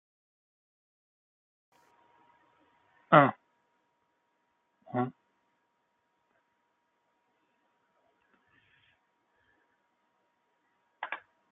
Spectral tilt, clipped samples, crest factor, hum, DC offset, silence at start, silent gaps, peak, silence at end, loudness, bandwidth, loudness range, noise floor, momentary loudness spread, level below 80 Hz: -5 dB/octave; under 0.1%; 32 dB; none; under 0.1%; 3.1 s; none; -6 dBFS; 0.35 s; -28 LUFS; 4 kHz; 15 LU; -77 dBFS; 20 LU; -82 dBFS